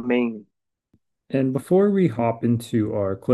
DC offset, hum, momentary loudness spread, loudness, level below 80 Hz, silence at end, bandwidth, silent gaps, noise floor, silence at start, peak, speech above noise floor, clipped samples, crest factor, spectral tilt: under 0.1%; none; 8 LU; -22 LUFS; -64 dBFS; 0 s; 12.5 kHz; none; -67 dBFS; 0 s; -6 dBFS; 46 dB; under 0.1%; 16 dB; -8 dB/octave